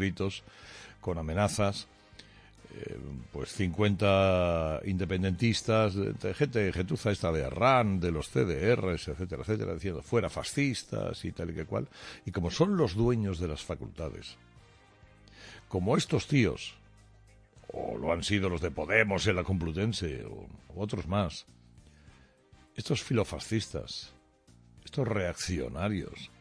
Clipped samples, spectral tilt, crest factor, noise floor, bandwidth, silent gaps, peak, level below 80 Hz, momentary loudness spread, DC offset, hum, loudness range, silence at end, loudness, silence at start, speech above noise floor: under 0.1%; -6 dB/octave; 24 dB; -61 dBFS; 11 kHz; none; -8 dBFS; -50 dBFS; 16 LU; under 0.1%; none; 7 LU; 0.15 s; -31 LUFS; 0 s; 30 dB